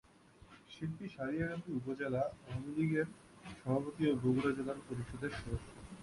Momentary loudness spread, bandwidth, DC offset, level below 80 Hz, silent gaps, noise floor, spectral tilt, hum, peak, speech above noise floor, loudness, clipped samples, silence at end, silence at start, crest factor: 11 LU; 11.5 kHz; under 0.1%; -58 dBFS; none; -62 dBFS; -7.5 dB/octave; none; -20 dBFS; 24 dB; -39 LUFS; under 0.1%; 0 s; 0.4 s; 18 dB